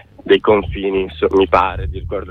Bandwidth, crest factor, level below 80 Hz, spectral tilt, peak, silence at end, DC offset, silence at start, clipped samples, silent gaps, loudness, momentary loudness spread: 6 kHz; 16 dB; -32 dBFS; -7.5 dB/octave; 0 dBFS; 0 s; under 0.1%; 0.25 s; under 0.1%; none; -16 LUFS; 11 LU